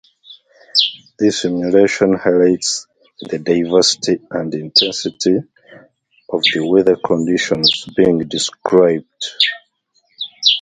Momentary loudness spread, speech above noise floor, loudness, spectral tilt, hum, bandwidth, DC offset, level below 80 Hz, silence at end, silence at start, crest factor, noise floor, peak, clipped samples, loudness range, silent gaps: 10 LU; 47 dB; -15 LUFS; -3.5 dB/octave; none; 9.6 kHz; under 0.1%; -54 dBFS; 0 s; 0.3 s; 16 dB; -62 dBFS; 0 dBFS; under 0.1%; 2 LU; none